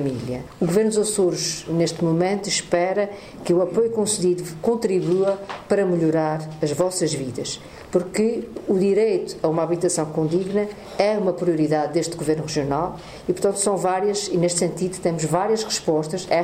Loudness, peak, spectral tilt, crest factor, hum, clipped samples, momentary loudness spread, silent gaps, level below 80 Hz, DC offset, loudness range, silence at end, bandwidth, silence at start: -22 LUFS; -2 dBFS; -5 dB/octave; 18 dB; none; under 0.1%; 6 LU; none; -54 dBFS; under 0.1%; 1 LU; 0 s; 16 kHz; 0 s